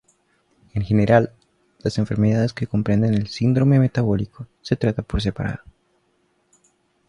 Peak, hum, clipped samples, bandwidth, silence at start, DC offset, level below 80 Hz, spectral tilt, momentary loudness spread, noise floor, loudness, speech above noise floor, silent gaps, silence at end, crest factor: -2 dBFS; none; under 0.1%; 10 kHz; 0.75 s; under 0.1%; -40 dBFS; -8 dB/octave; 12 LU; -65 dBFS; -21 LUFS; 46 dB; none; 1.55 s; 20 dB